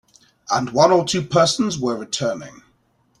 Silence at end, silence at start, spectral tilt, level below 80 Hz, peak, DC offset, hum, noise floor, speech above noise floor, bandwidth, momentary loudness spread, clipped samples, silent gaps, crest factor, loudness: 0.7 s; 0.5 s; -4.5 dB/octave; -56 dBFS; -2 dBFS; under 0.1%; none; -62 dBFS; 43 dB; 13 kHz; 9 LU; under 0.1%; none; 18 dB; -19 LUFS